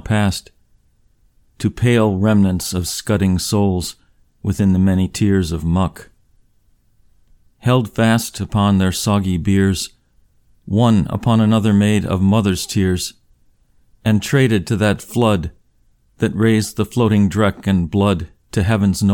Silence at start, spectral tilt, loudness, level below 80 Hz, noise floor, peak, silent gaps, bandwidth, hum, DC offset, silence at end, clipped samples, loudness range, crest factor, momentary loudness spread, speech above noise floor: 0.05 s; -6 dB/octave; -17 LUFS; -40 dBFS; -57 dBFS; -2 dBFS; none; 17.5 kHz; none; under 0.1%; 0 s; under 0.1%; 3 LU; 16 dB; 9 LU; 41 dB